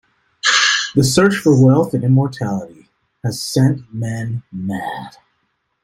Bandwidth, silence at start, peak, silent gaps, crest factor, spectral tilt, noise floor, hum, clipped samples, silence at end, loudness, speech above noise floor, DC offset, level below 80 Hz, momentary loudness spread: 15 kHz; 0.45 s; -2 dBFS; none; 16 dB; -5 dB/octave; -68 dBFS; none; under 0.1%; 0.75 s; -16 LUFS; 52 dB; under 0.1%; -52 dBFS; 13 LU